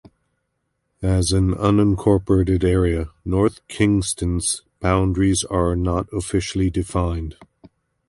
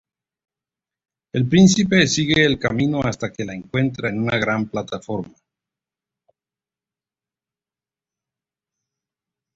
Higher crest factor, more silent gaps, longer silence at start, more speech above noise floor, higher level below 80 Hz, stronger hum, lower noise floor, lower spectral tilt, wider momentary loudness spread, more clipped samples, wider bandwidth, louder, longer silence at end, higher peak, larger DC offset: about the same, 18 dB vs 20 dB; neither; second, 1 s vs 1.35 s; second, 54 dB vs over 71 dB; first, -32 dBFS vs -50 dBFS; neither; second, -73 dBFS vs under -90 dBFS; about the same, -6 dB/octave vs -5 dB/octave; second, 7 LU vs 14 LU; neither; first, 11.5 kHz vs 8 kHz; about the same, -20 LUFS vs -19 LUFS; second, 0.65 s vs 4.3 s; about the same, -2 dBFS vs -2 dBFS; neither